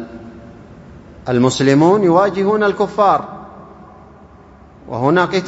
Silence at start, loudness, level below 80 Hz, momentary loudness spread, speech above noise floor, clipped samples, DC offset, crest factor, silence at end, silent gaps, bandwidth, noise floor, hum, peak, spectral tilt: 0 s; -14 LUFS; -48 dBFS; 21 LU; 29 dB; under 0.1%; under 0.1%; 16 dB; 0 s; none; 8 kHz; -42 dBFS; none; 0 dBFS; -6 dB/octave